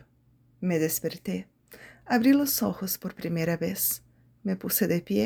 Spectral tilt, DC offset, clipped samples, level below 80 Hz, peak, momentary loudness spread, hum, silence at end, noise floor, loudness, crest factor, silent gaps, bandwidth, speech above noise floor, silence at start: -5 dB/octave; under 0.1%; under 0.1%; -62 dBFS; -10 dBFS; 13 LU; none; 0 s; -63 dBFS; -27 LUFS; 18 dB; none; over 20 kHz; 36 dB; 0.6 s